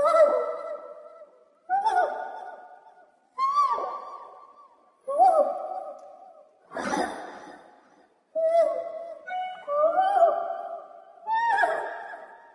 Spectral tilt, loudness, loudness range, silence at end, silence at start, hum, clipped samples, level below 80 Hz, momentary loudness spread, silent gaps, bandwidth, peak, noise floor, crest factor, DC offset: -3.5 dB/octave; -26 LUFS; 4 LU; 0.15 s; 0 s; none; under 0.1%; -74 dBFS; 21 LU; none; 11.5 kHz; -8 dBFS; -60 dBFS; 18 dB; under 0.1%